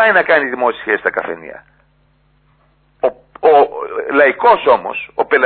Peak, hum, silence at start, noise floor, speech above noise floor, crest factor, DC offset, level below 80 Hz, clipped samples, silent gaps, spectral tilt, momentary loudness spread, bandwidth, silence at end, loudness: 0 dBFS; none; 0 s; -56 dBFS; 42 dB; 14 dB; under 0.1%; -56 dBFS; under 0.1%; none; -7.5 dB/octave; 12 LU; 4.5 kHz; 0 s; -14 LUFS